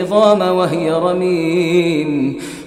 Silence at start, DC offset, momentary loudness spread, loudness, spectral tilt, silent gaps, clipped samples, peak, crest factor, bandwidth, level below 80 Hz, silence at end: 0 s; under 0.1%; 6 LU; -15 LUFS; -6.5 dB/octave; none; under 0.1%; 0 dBFS; 14 dB; 14.5 kHz; -54 dBFS; 0 s